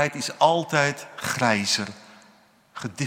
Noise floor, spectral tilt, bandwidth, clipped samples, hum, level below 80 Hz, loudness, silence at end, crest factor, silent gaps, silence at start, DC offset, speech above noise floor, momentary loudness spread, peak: -57 dBFS; -3.5 dB/octave; 16.5 kHz; under 0.1%; none; -70 dBFS; -23 LUFS; 0 s; 22 dB; none; 0 s; under 0.1%; 33 dB; 15 LU; -4 dBFS